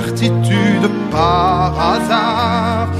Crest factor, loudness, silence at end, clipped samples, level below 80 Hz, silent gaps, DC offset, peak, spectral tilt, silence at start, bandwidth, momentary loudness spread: 14 dB; -14 LUFS; 0 s; under 0.1%; -34 dBFS; none; under 0.1%; 0 dBFS; -6 dB/octave; 0 s; 14.5 kHz; 3 LU